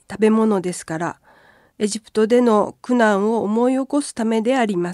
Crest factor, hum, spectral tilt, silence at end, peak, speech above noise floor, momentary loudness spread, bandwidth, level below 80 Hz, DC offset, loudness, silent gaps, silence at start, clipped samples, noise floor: 16 dB; none; -5.5 dB/octave; 0 s; -4 dBFS; 34 dB; 10 LU; 12 kHz; -62 dBFS; under 0.1%; -19 LUFS; none; 0.1 s; under 0.1%; -52 dBFS